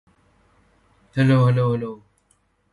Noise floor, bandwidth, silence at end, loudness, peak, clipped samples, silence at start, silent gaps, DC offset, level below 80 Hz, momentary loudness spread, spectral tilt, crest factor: -65 dBFS; 11 kHz; 0.75 s; -20 LUFS; -8 dBFS; under 0.1%; 1.15 s; none; under 0.1%; -54 dBFS; 17 LU; -8.5 dB/octave; 16 dB